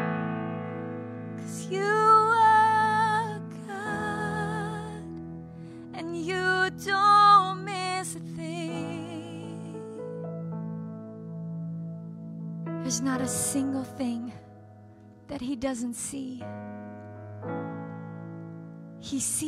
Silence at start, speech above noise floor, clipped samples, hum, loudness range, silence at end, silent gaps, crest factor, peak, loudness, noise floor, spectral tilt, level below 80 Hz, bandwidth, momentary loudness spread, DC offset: 0 s; 21 dB; under 0.1%; none; 13 LU; 0 s; none; 20 dB; -8 dBFS; -27 LUFS; -51 dBFS; -4 dB/octave; -64 dBFS; 15.5 kHz; 21 LU; under 0.1%